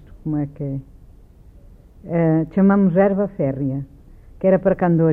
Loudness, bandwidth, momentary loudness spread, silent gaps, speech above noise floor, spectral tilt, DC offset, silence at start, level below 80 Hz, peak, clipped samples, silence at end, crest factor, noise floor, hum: -19 LUFS; 3.1 kHz; 13 LU; none; 28 dB; -12 dB/octave; under 0.1%; 0.15 s; -44 dBFS; -4 dBFS; under 0.1%; 0 s; 14 dB; -45 dBFS; none